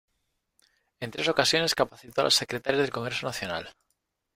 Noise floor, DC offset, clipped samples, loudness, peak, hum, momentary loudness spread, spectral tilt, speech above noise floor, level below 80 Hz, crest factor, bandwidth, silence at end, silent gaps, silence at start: -78 dBFS; under 0.1%; under 0.1%; -26 LUFS; -4 dBFS; none; 13 LU; -2.5 dB/octave; 51 dB; -62 dBFS; 26 dB; 16 kHz; 0.65 s; none; 1 s